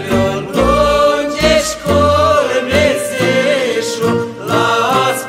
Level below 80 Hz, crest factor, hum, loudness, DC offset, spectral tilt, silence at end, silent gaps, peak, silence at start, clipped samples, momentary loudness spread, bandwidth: -32 dBFS; 12 dB; none; -13 LUFS; under 0.1%; -4.5 dB/octave; 0 s; none; 0 dBFS; 0 s; under 0.1%; 5 LU; 16 kHz